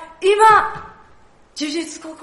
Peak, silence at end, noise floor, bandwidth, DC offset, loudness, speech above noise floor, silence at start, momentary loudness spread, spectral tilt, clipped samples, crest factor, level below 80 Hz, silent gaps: -2 dBFS; 0.1 s; -51 dBFS; 11.5 kHz; under 0.1%; -16 LUFS; 35 dB; 0 s; 22 LU; -2.5 dB/octave; under 0.1%; 16 dB; -52 dBFS; none